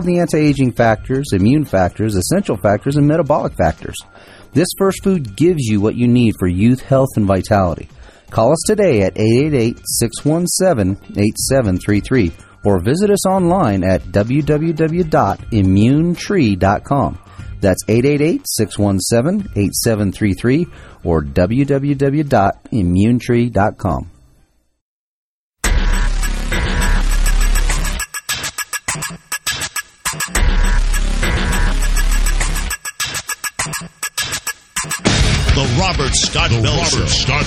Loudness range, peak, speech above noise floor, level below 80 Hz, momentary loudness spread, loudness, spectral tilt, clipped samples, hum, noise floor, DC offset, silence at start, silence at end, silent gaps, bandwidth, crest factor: 5 LU; 0 dBFS; 40 dB; -22 dBFS; 8 LU; -16 LUFS; -5 dB/octave; under 0.1%; none; -55 dBFS; under 0.1%; 0 s; 0 s; 24.81-25.53 s; 15.5 kHz; 14 dB